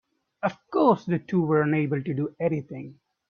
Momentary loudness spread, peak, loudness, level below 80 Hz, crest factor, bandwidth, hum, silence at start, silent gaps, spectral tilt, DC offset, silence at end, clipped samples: 13 LU; -6 dBFS; -25 LUFS; -66 dBFS; 18 dB; 6.8 kHz; none; 0.4 s; none; -9.5 dB/octave; under 0.1%; 0.4 s; under 0.1%